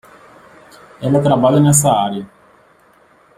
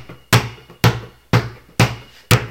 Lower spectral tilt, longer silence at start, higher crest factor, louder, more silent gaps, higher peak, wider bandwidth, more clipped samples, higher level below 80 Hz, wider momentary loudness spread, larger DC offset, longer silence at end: about the same, -5.5 dB/octave vs -4.5 dB/octave; first, 1 s vs 0 s; about the same, 16 dB vs 18 dB; first, -13 LUFS vs -18 LUFS; neither; about the same, 0 dBFS vs 0 dBFS; about the same, 16 kHz vs 17.5 kHz; neither; second, -50 dBFS vs -38 dBFS; about the same, 13 LU vs 13 LU; neither; first, 1.1 s vs 0 s